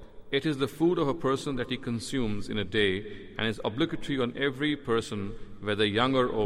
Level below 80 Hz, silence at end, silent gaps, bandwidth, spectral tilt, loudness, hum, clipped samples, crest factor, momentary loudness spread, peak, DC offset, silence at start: -48 dBFS; 0 s; none; 15 kHz; -5.5 dB/octave; -29 LUFS; none; under 0.1%; 16 dB; 8 LU; -12 dBFS; under 0.1%; 0 s